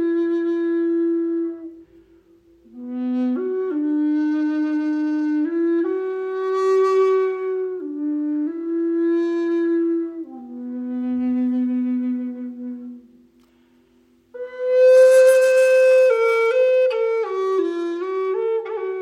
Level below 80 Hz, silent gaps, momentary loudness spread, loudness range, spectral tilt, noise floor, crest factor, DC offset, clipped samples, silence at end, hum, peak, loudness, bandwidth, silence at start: -70 dBFS; none; 16 LU; 10 LU; -4 dB/octave; -57 dBFS; 14 dB; under 0.1%; under 0.1%; 0 s; none; -6 dBFS; -20 LUFS; 14 kHz; 0 s